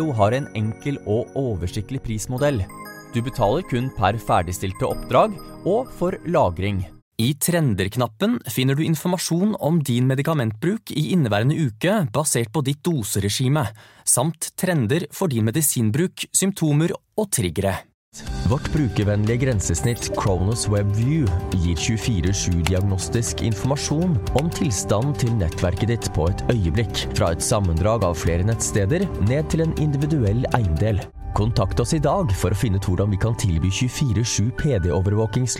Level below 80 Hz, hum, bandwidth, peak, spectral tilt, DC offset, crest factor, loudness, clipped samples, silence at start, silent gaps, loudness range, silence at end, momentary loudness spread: -36 dBFS; none; 17 kHz; -2 dBFS; -5.5 dB/octave; under 0.1%; 20 dB; -22 LUFS; under 0.1%; 0 s; 7.02-7.12 s, 17.94-18.12 s; 2 LU; 0 s; 6 LU